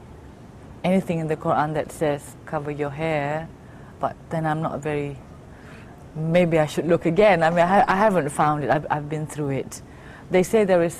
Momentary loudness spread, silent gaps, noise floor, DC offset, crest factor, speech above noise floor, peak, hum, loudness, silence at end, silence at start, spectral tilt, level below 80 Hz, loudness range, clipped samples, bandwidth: 19 LU; none; -43 dBFS; under 0.1%; 18 dB; 21 dB; -6 dBFS; none; -22 LUFS; 0 s; 0 s; -6.5 dB/octave; -48 dBFS; 8 LU; under 0.1%; 15 kHz